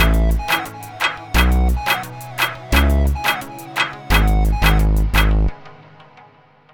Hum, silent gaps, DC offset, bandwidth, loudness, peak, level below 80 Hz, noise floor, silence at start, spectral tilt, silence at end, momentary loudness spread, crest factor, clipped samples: none; none; under 0.1%; 18.5 kHz; -18 LUFS; 0 dBFS; -18 dBFS; -49 dBFS; 0 s; -5 dB/octave; 1 s; 6 LU; 16 dB; under 0.1%